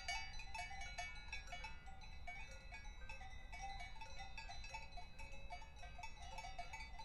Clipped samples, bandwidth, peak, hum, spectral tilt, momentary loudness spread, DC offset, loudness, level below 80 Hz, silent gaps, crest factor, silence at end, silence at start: under 0.1%; 12.5 kHz; -32 dBFS; none; -2.5 dB/octave; 7 LU; under 0.1%; -53 LUFS; -56 dBFS; none; 18 dB; 0 s; 0 s